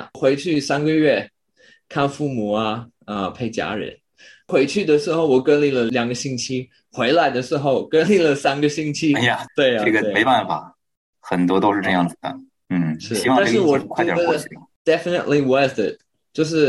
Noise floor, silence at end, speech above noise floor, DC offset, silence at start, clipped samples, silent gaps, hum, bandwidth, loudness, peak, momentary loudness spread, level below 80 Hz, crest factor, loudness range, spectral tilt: -55 dBFS; 0 s; 36 dB; under 0.1%; 0 s; under 0.1%; 10.97-11.13 s, 14.76-14.85 s; none; 12.5 kHz; -19 LUFS; -4 dBFS; 10 LU; -60 dBFS; 16 dB; 4 LU; -5 dB/octave